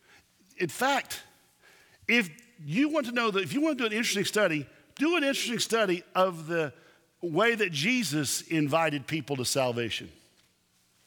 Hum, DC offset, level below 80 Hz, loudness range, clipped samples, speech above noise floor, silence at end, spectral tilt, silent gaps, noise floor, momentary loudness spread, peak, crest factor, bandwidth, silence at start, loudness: none; under 0.1%; -72 dBFS; 2 LU; under 0.1%; 40 dB; 0.95 s; -3.5 dB/octave; none; -68 dBFS; 9 LU; -10 dBFS; 20 dB; 19.5 kHz; 0.6 s; -28 LUFS